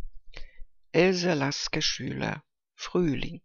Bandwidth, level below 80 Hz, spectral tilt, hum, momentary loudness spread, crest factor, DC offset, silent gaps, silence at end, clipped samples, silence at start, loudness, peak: 7.4 kHz; -46 dBFS; -4.5 dB/octave; none; 14 LU; 22 dB; under 0.1%; none; 0.05 s; under 0.1%; 0 s; -27 LUFS; -8 dBFS